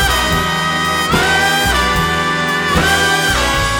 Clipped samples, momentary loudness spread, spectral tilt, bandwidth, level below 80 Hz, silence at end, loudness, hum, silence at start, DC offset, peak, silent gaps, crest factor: under 0.1%; 3 LU; -3 dB/octave; 19.5 kHz; -26 dBFS; 0 s; -13 LUFS; none; 0 s; under 0.1%; 0 dBFS; none; 14 dB